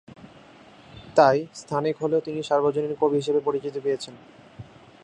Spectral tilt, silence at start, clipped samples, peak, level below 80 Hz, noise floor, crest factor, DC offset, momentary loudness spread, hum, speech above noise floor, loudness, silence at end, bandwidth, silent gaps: -6 dB/octave; 0.2 s; under 0.1%; -2 dBFS; -64 dBFS; -50 dBFS; 22 dB; under 0.1%; 9 LU; none; 26 dB; -24 LUFS; 0.4 s; 10.5 kHz; none